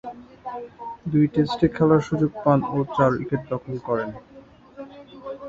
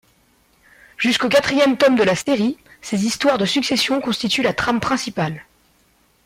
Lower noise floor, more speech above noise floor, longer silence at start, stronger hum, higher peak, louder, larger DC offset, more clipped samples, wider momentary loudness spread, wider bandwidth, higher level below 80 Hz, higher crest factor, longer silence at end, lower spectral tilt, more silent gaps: second, -47 dBFS vs -59 dBFS; second, 25 dB vs 41 dB; second, 0.05 s vs 1 s; neither; about the same, -4 dBFS vs -6 dBFS; second, -22 LUFS vs -18 LUFS; neither; neither; first, 21 LU vs 9 LU; second, 7.6 kHz vs 16 kHz; about the same, -52 dBFS vs -52 dBFS; first, 20 dB vs 14 dB; second, 0 s vs 0.85 s; first, -8.5 dB/octave vs -4 dB/octave; neither